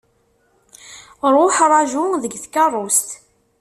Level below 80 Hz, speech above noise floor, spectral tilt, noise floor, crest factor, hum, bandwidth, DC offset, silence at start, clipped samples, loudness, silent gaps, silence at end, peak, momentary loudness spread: -64 dBFS; 45 dB; -2 dB/octave; -61 dBFS; 18 dB; none; 14 kHz; under 0.1%; 0.85 s; under 0.1%; -16 LUFS; none; 0.45 s; -2 dBFS; 15 LU